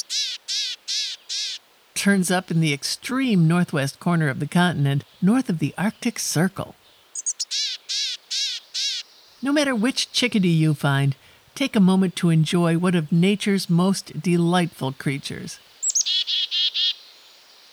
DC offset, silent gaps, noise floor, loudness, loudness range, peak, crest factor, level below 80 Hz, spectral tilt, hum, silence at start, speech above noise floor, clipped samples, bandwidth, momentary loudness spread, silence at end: under 0.1%; none; -50 dBFS; -22 LUFS; 4 LU; -6 dBFS; 16 dB; -66 dBFS; -4.5 dB/octave; none; 0.1 s; 29 dB; under 0.1%; 16 kHz; 8 LU; 0.75 s